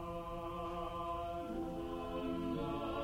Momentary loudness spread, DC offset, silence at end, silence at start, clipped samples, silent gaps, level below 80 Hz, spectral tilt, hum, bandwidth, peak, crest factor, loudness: 4 LU; under 0.1%; 0 s; 0 s; under 0.1%; none; -54 dBFS; -7 dB/octave; none; 16 kHz; -28 dBFS; 12 dB; -42 LUFS